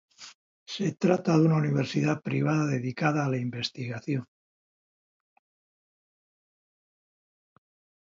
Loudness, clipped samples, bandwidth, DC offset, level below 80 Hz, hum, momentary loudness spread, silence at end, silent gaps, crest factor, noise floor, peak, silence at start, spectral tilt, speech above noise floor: -27 LUFS; under 0.1%; 7.6 kHz; under 0.1%; -70 dBFS; none; 13 LU; 3.9 s; 0.35-0.66 s; 20 dB; under -90 dBFS; -10 dBFS; 0.2 s; -7 dB/octave; over 64 dB